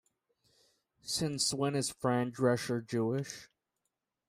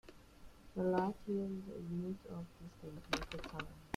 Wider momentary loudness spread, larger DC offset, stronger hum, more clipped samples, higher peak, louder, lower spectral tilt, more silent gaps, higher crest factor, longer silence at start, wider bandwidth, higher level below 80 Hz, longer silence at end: second, 10 LU vs 16 LU; neither; neither; neither; first, -16 dBFS vs -20 dBFS; first, -33 LUFS vs -42 LUFS; second, -4.5 dB/octave vs -6 dB/octave; neither; about the same, 18 dB vs 22 dB; first, 1.05 s vs 0.05 s; about the same, 15.5 kHz vs 15 kHz; second, -70 dBFS vs -60 dBFS; first, 0.85 s vs 0 s